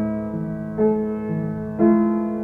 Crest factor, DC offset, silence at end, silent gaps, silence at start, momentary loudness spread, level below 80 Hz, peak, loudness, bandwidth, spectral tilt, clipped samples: 16 dB; under 0.1%; 0 s; none; 0 s; 10 LU; -48 dBFS; -4 dBFS; -22 LUFS; 2.8 kHz; -11.5 dB/octave; under 0.1%